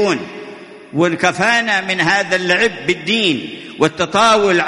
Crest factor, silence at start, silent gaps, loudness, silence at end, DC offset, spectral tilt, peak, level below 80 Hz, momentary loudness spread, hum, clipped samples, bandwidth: 16 dB; 0 s; none; -15 LUFS; 0 s; under 0.1%; -3.5 dB/octave; 0 dBFS; -54 dBFS; 13 LU; none; under 0.1%; 11.5 kHz